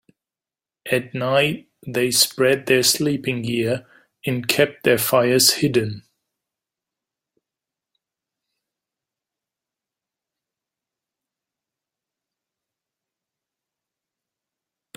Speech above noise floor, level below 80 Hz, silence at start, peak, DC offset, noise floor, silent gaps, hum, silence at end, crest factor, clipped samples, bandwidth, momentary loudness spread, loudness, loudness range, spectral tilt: over 71 dB; -62 dBFS; 0.85 s; 0 dBFS; under 0.1%; under -90 dBFS; none; none; 8.95 s; 24 dB; under 0.1%; 16.5 kHz; 13 LU; -19 LUFS; 4 LU; -3.5 dB/octave